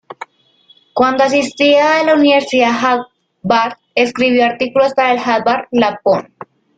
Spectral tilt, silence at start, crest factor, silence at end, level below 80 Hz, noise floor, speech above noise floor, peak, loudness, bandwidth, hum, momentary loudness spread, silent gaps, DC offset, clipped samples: -4.5 dB/octave; 0.1 s; 14 dB; 0.55 s; -56 dBFS; -51 dBFS; 39 dB; 0 dBFS; -13 LUFS; 9.2 kHz; none; 7 LU; none; under 0.1%; under 0.1%